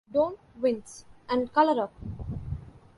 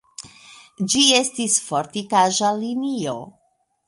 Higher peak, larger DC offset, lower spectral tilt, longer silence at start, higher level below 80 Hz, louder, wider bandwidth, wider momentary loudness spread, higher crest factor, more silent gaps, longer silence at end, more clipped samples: second, -10 dBFS vs -2 dBFS; neither; first, -6.5 dB/octave vs -2 dB/octave; about the same, 0.15 s vs 0.2 s; first, -48 dBFS vs -64 dBFS; second, -28 LUFS vs -19 LUFS; about the same, 11.5 kHz vs 11.5 kHz; second, 16 LU vs 19 LU; about the same, 20 dB vs 20 dB; neither; second, 0.2 s vs 0.6 s; neither